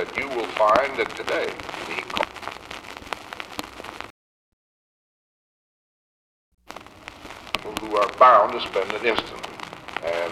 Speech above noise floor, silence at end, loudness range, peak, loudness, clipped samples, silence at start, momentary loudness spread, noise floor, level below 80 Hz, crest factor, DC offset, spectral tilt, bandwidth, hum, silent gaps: 22 dB; 0 s; 19 LU; 0 dBFS; -22 LUFS; under 0.1%; 0 s; 22 LU; -43 dBFS; -56 dBFS; 26 dB; under 0.1%; -3.5 dB/octave; 15 kHz; none; 4.10-6.58 s